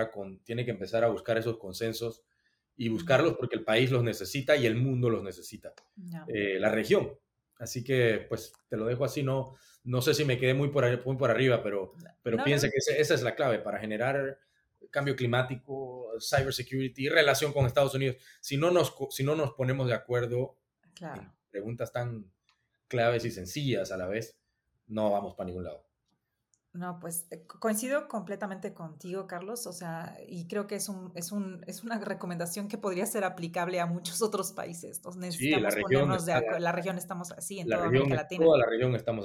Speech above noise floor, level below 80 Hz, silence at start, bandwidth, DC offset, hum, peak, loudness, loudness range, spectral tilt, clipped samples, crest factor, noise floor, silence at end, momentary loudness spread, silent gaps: 49 dB; -62 dBFS; 0 s; 18 kHz; under 0.1%; none; -6 dBFS; -30 LUFS; 8 LU; -5 dB/octave; under 0.1%; 24 dB; -79 dBFS; 0 s; 14 LU; none